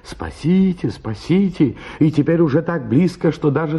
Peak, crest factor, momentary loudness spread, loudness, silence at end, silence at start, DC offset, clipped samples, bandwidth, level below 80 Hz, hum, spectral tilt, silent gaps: -2 dBFS; 14 dB; 9 LU; -18 LUFS; 0 s; 0.05 s; under 0.1%; under 0.1%; 11 kHz; -44 dBFS; none; -8.5 dB/octave; none